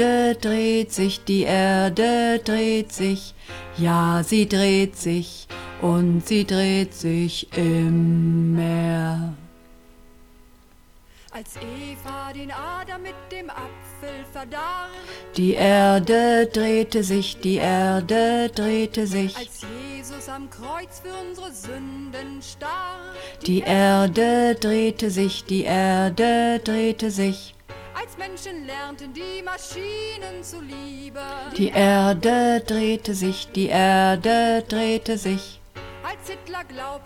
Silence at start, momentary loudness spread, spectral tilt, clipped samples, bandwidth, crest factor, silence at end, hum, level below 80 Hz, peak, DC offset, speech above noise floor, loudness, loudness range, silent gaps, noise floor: 0 s; 17 LU; -5.5 dB/octave; under 0.1%; 16.5 kHz; 16 dB; 0.05 s; none; -48 dBFS; -6 dBFS; under 0.1%; 29 dB; -21 LUFS; 14 LU; none; -51 dBFS